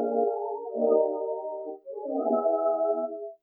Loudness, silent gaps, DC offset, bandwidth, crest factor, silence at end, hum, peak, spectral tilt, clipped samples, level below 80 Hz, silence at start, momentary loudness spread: -28 LUFS; none; under 0.1%; 1.5 kHz; 16 dB; 0.05 s; none; -10 dBFS; -12.5 dB/octave; under 0.1%; under -90 dBFS; 0 s; 12 LU